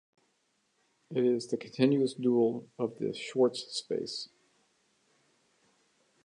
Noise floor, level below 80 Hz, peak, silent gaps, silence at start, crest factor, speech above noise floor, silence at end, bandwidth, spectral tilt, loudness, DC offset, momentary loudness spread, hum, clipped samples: -75 dBFS; -82 dBFS; -12 dBFS; none; 1.1 s; 20 dB; 45 dB; 2 s; 11 kHz; -5.5 dB/octave; -31 LUFS; under 0.1%; 10 LU; none; under 0.1%